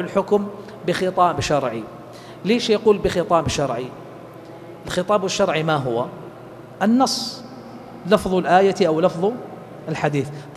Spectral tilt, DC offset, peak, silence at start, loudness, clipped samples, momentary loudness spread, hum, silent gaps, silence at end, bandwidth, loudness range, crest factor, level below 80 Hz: -5 dB/octave; under 0.1%; -2 dBFS; 0 s; -20 LUFS; under 0.1%; 21 LU; none; none; 0 s; 14 kHz; 3 LU; 20 dB; -48 dBFS